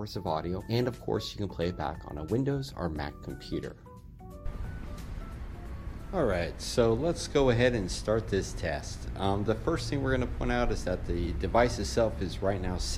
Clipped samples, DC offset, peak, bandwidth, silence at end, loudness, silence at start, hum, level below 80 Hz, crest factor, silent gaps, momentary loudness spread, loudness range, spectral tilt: under 0.1%; under 0.1%; -10 dBFS; 16 kHz; 0 s; -31 LUFS; 0 s; none; -40 dBFS; 20 dB; none; 16 LU; 8 LU; -5.5 dB/octave